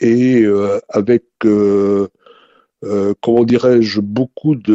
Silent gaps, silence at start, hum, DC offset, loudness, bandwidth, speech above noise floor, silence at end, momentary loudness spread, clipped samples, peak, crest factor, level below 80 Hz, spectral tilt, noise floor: none; 0 s; none; under 0.1%; -14 LUFS; 8 kHz; 37 dB; 0 s; 7 LU; under 0.1%; 0 dBFS; 12 dB; -54 dBFS; -7.5 dB/octave; -50 dBFS